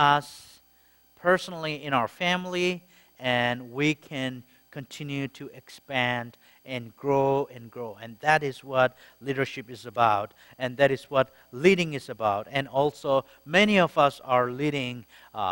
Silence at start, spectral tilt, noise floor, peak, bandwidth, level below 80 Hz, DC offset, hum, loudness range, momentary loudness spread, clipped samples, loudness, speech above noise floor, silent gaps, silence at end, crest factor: 0 s; -5.5 dB/octave; -61 dBFS; -6 dBFS; 16.5 kHz; -64 dBFS; under 0.1%; none; 6 LU; 17 LU; under 0.1%; -26 LUFS; 34 dB; none; 0 s; 22 dB